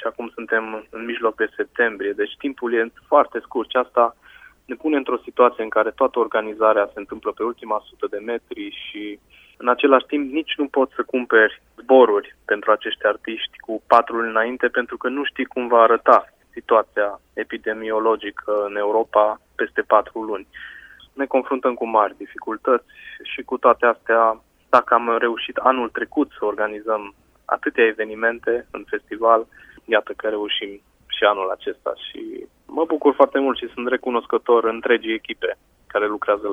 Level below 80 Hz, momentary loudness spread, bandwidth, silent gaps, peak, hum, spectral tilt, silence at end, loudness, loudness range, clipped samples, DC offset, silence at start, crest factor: -60 dBFS; 15 LU; 5.8 kHz; none; 0 dBFS; none; -5 dB/octave; 0 s; -20 LUFS; 4 LU; under 0.1%; under 0.1%; 0 s; 20 dB